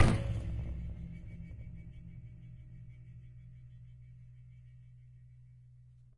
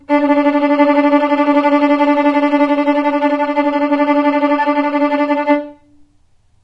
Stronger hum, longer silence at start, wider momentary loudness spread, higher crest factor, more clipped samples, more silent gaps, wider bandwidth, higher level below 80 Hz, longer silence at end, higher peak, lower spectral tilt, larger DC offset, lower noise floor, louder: neither; about the same, 0 s vs 0.1 s; first, 19 LU vs 3 LU; first, 28 dB vs 12 dB; neither; neither; first, 11 kHz vs 5.8 kHz; first, -44 dBFS vs -56 dBFS; second, 0.15 s vs 0.9 s; second, -10 dBFS vs -2 dBFS; first, -7 dB/octave vs -5.5 dB/octave; neither; first, -58 dBFS vs -52 dBFS; second, -42 LUFS vs -13 LUFS